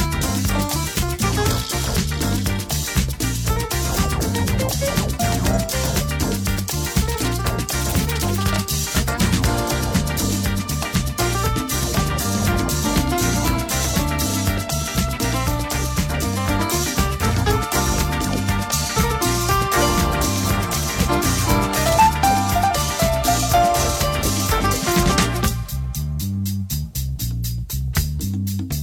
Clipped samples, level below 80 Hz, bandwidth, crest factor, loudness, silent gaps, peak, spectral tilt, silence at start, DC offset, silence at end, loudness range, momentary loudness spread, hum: under 0.1%; -28 dBFS; over 20 kHz; 18 dB; -20 LUFS; none; -2 dBFS; -4 dB/octave; 0 s; under 0.1%; 0 s; 3 LU; 5 LU; none